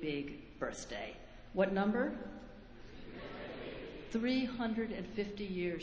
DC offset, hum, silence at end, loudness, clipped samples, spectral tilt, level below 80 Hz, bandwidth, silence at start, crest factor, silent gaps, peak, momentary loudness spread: under 0.1%; none; 0 s; -39 LUFS; under 0.1%; -6 dB/octave; -58 dBFS; 8 kHz; 0 s; 22 dB; none; -18 dBFS; 18 LU